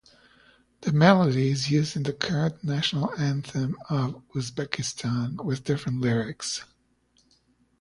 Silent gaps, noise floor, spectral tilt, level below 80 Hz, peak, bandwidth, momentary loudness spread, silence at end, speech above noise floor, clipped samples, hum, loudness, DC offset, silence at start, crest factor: none; -66 dBFS; -5.5 dB/octave; -58 dBFS; -4 dBFS; 11.5 kHz; 11 LU; 1.15 s; 41 dB; under 0.1%; none; -26 LUFS; under 0.1%; 0.8 s; 22 dB